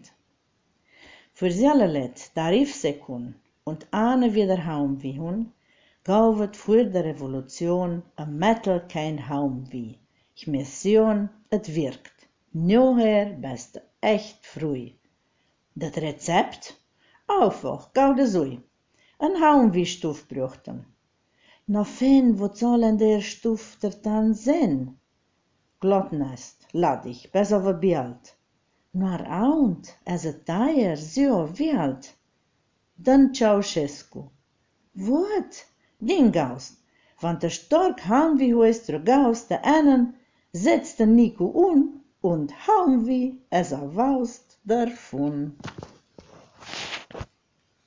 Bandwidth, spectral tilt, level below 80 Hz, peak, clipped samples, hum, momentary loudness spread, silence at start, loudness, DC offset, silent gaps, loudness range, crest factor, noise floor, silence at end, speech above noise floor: 7.6 kHz; -6.5 dB/octave; -56 dBFS; -6 dBFS; under 0.1%; none; 17 LU; 1.4 s; -23 LUFS; under 0.1%; none; 6 LU; 16 dB; -70 dBFS; 0.6 s; 48 dB